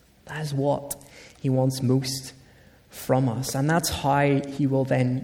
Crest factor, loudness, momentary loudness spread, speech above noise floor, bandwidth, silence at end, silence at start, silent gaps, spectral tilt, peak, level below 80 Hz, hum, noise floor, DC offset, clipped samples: 16 dB; -25 LUFS; 14 LU; 30 dB; 18 kHz; 0 s; 0.25 s; none; -5.5 dB/octave; -8 dBFS; -52 dBFS; none; -53 dBFS; under 0.1%; under 0.1%